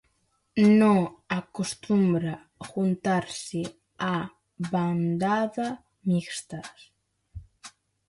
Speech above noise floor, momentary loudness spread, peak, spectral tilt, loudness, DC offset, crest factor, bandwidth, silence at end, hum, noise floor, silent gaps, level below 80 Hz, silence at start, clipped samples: 46 dB; 17 LU; -10 dBFS; -6.5 dB/octave; -26 LUFS; under 0.1%; 18 dB; 11.5 kHz; 0.4 s; none; -71 dBFS; none; -60 dBFS; 0.55 s; under 0.1%